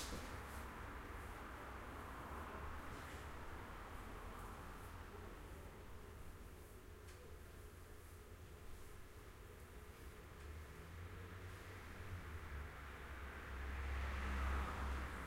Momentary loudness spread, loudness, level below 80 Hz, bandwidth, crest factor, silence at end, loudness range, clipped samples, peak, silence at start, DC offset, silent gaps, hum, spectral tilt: 13 LU; -52 LUFS; -52 dBFS; 16 kHz; 20 dB; 0 s; 10 LU; under 0.1%; -32 dBFS; 0 s; under 0.1%; none; none; -5 dB/octave